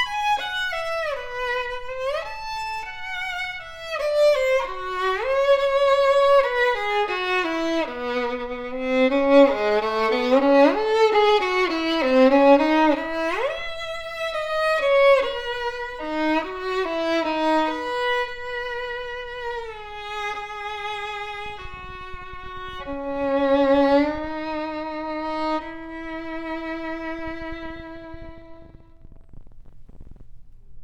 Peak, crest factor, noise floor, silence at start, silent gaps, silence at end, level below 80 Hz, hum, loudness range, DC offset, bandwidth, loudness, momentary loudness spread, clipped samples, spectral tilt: -4 dBFS; 18 dB; -44 dBFS; 0 s; none; 0 s; -46 dBFS; none; 13 LU; under 0.1%; 12 kHz; -22 LUFS; 16 LU; under 0.1%; -4 dB/octave